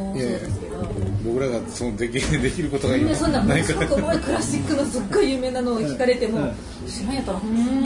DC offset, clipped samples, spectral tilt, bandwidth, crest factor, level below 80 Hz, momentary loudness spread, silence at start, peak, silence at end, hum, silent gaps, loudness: under 0.1%; under 0.1%; -5.5 dB/octave; 11 kHz; 16 dB; -36 dBFS; 8 LU; 0 s; -6 dBFS; 0 s; none; none; -23 LUFS